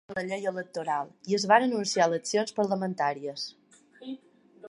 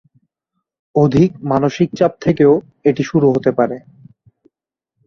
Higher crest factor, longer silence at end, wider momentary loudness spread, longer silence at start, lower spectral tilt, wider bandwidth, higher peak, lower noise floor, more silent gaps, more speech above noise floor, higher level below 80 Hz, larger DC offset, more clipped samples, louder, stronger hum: first, 22 dB vs 16 dB; second, 0 s vs 1.3 s; first, 20 LU vs 6 LU; second, 0.1 s vs 0.95 s; second, -4 dB/octave vs -8 dB/octave; first, 11.5 kHz vs 7 kHz; second, -8 dBFS vs -2 dBFS; second, -53 dBFS vs -80 dBFS; neither; second, 26 dB vs 66 dB; second, -76 dBFS vs -50 dBFS; neither; neither; second, -28 LUFS vs -15 LUFS; neither